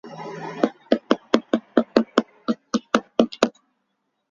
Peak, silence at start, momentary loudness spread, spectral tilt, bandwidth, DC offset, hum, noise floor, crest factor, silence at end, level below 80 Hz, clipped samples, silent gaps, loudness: 0 dBFS; 0.05 s; 8 LU; -5 dB/octave; 7.6 kHz; under 0.1%; none; -74 dBFS; 24 dB; 0.85 s; -62 dBFS; under 0.1%; none; -23 LUFS